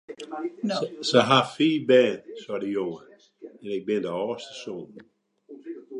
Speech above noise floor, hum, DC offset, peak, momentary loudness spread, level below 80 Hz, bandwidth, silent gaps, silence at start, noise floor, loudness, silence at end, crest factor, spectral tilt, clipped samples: 24 dB; none; under 0.1%; -2 dBFS; 21 LU; -74 dBFS; 11 kHz; none; 0.1 s; -49 dBFS; -24 LUFS; 0 s; 24 dB; -5 dB/octave; under 0.1%